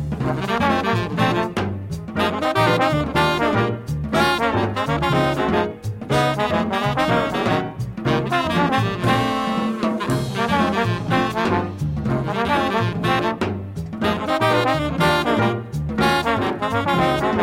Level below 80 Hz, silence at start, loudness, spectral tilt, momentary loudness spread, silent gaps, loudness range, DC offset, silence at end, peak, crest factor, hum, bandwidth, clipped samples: -40 dBFS; 0 s; -20 LUFS; -6 dB/octave; 6 LU; none; 2 LU; under 0.1%; 0 s; -4 dBFS; 16 dB; none; 16.5 kHz; under 0.1%